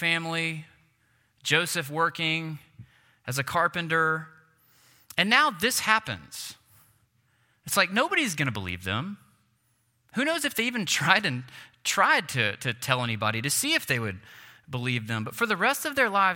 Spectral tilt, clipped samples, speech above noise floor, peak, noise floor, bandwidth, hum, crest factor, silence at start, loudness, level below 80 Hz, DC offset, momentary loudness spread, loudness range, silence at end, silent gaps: -3 dB/octave; under 0.1%; 44 dB; -2 dBFS; -70 dBFS; 17 kHz; none; 26 dB; 0 s; -26 LUFS; -68 dBFS; under 0.1%; 15 LU; 4 LU; 0 s; none